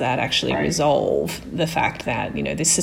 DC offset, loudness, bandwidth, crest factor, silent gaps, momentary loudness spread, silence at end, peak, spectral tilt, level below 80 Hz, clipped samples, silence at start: under 0.1%; -21 LUFS; 17 kHz; 16 dB; none; 6 LU; 0 s; -6 dBFS; -3.5 dB/octave; -44 dBFS; under 0.1%; 0 s